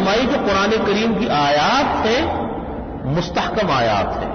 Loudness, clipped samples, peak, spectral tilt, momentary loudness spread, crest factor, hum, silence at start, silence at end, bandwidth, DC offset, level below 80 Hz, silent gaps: -18 LUFS; under 0.1%; -8 dBFS; -5 dB/octave; 9 LU; 10 dB; none; 0 s; 0 s; 6.6 kHz; under 0.1%; -36 dBFS; none